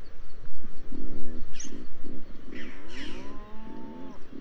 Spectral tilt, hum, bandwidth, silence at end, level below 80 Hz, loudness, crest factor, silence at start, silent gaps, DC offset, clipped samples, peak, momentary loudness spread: -5 dB/octave; none; 7 kHz; 0 s; -40 dBFS; -44 LUFS; 10 dB; 0 s; none; under 0.1%; under 0.1%; -8 dBFS; 8 LU